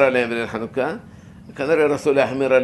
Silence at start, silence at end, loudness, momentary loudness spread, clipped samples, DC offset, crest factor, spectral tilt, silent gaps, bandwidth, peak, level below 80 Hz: 0 s; 0 s; -20 LUFS; 10 LU; under 0.1%; under 0.1%; 18 dB; -5.5 dB/octave; none; 12 kHz; -2 dBFS; -54 dBFS